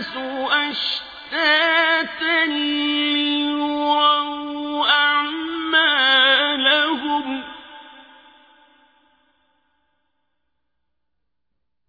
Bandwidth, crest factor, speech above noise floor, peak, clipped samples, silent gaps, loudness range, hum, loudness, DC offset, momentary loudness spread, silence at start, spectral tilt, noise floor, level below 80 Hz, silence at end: 5 kHz; 18 dB; 61 dB; -4 dBFS; under 0.1%; none; 7 LU; none; -18 LUFS; under 0.1%; 13 LU; 0 s; -3 dB/octave; -80 dBFS; -64 dBFS; 3.85 s